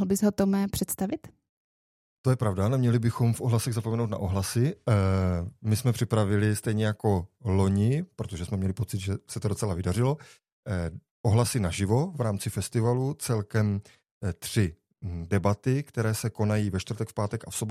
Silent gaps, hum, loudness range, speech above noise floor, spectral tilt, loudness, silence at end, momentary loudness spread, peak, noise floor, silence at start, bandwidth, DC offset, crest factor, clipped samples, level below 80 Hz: 1.49-2.24 s, 10.52-10.63 s, 11.11-11.24 s, 14.11-14.21 s; none; 3 LU; over 63 dB; -6.5 dB/octave; -28 LUFS; 0 s; 8 LU; -8 dBFS; under -90 dBFS; 0 s; 15.5 kHz; under 0.1%; 18 dB; under 0.1%; -54 dBFS